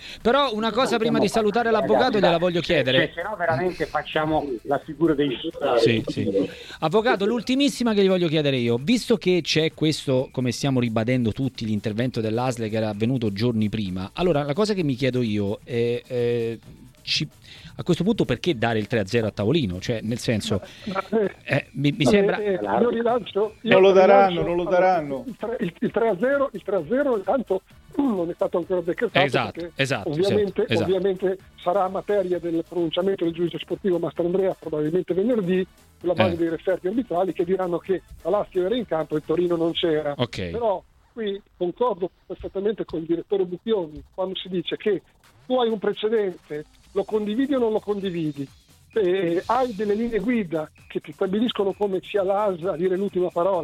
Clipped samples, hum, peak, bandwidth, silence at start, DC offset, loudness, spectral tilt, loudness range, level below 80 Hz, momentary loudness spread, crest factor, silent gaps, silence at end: under 0.1%; none; -2 dBFS; 14.5 kHz; 0 s; under 0.1%; -23 LUFS; -6 dB/octave; 6 LU; -52 dBFS; 9 LU; 22 dB; none; 0 s